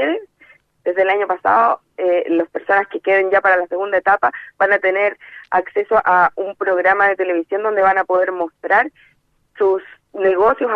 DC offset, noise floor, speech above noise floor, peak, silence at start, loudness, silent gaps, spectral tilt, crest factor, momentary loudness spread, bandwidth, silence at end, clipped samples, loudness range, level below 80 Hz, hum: under 0.1%; -57 dBFS; 41 dB; -2 dBFS; 0 s; -17 LUFS; none; -6 dB/octave; 16 dB; 7 LU; 5.6 kHz; 0 s; under 0.1%; 2 LU; -58 dBFS; none